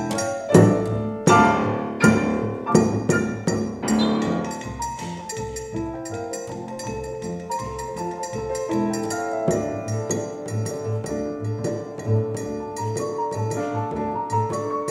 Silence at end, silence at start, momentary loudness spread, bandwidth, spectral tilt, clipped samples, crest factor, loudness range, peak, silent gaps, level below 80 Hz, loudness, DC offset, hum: 0 s; 0 s; 12 LU; 15 kHz; -6 dB/octave; under 0.1%; 24 dB; 10 LU; 0 dBFS; none; -48 dBFS; -24 LUFS; under 0.1%; none